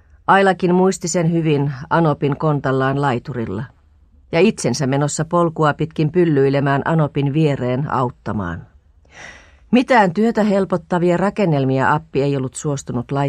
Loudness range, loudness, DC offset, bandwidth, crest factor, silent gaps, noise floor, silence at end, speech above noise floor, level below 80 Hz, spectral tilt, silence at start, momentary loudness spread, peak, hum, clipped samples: 3 LU; -18 LUFS; under 0.1%; 10.5 kHz; 16 dB; none; -50 dBFS; 0 s; 34 dB; -48 dBFS; -6.5 dB/octave; 0.3 s; 10 LU; -2 dBFS; none; under 0.1%